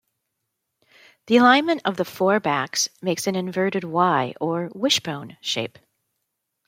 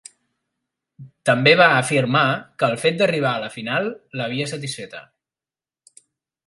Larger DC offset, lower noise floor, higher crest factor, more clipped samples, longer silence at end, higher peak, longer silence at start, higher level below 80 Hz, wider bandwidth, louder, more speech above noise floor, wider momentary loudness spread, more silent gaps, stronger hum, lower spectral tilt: neither; second, -79 dBFS vs under -90 dBFS; about the same, 20 dB vs 22 dB; neither; second, 1 s vs 1.45 s; about the same, -2 dBFS vs 0 dBFS; first, 1.25 s vs 1 s; second, -72 dBFS vs -66 dBFS; first, 16.5 kHz vs 11.5 kHz; about the same, -21 LUFS vs -19 LUFS; second, 57 dB vs over 70 dB; second, 10 LU vs 15 LU; neither; neither; about the same, -3.5 dB/octave vs -4.5 dB/octave